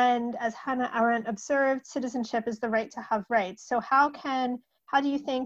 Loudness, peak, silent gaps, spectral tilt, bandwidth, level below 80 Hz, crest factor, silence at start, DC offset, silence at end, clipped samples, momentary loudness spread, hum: -28 LUFS; -10 dBFS; none; -4.5 dB/octave; 8.2 kHz; -70 dBFS; 18 dB; 0 s; under 0.1%; 0 s; under 0.1%; 7 LU; none